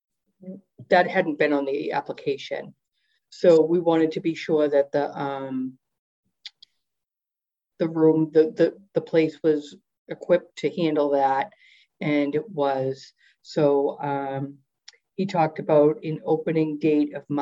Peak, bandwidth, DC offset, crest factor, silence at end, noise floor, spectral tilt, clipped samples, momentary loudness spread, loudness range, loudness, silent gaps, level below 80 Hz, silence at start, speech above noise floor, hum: -6 dBFS; 7.8 kHz; under 0.1%; 18 dB; 0 s; -89 dBFS; -7.5 dB/octave; under 0.1%; 15 LU; 4 LU; -23 LUFS; 5.99-6.23 s, 9.98-10.06 s; -76 dBFS; 0.45 s; 66 dB; none